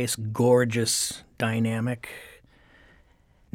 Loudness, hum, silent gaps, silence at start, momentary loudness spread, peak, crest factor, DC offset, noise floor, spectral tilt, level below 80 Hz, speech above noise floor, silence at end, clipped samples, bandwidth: -25 LUFS; none; none; 0 s; 14 LU; -8 dBFS; 18 dB; under 0.1%; -60 dBFS; -4.5 dB/octave; -60 dBFS; 35 dB; 1.25 s; under 0.1%; 17.5 kHz